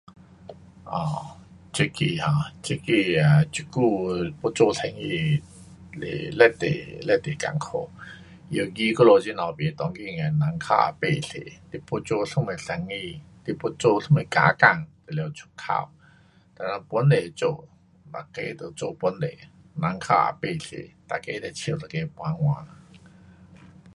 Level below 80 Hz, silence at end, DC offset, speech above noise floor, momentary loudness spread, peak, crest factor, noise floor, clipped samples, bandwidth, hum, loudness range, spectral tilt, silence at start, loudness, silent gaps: -56 dBFS; 1.3 s; under 0.1%; 32 dB; 16 LU; -2 dBFS; 24 dB; -56 dBFS; under 0.1%; 11.5 kHz; none; 5 LU; -6 dB/octave; 0.45 s; -24 LUFS; none